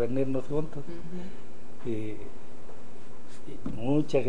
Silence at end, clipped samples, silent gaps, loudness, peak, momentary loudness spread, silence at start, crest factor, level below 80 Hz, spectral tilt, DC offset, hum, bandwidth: 0 s; under 0.1%; none; -33 LUFS; -14 dBFS; 21 LU; 0 s; 20 dB; -50 dBFS; -8 dB/octave; 6%; none; 10 kHz